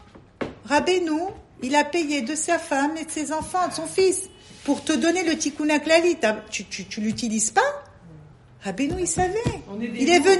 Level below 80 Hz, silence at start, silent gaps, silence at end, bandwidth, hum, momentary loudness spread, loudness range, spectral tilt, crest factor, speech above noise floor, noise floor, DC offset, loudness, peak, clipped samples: -50 dBFS; 0.15 s; none; 0 s; 11.5 kHz; none; 14 LU; 3 LU; -3.5 dB/octave; 18 dB; 25 dB; -47 dBFS; under 0.1%; -23 LUFS; -4 dBFS; under 0.1%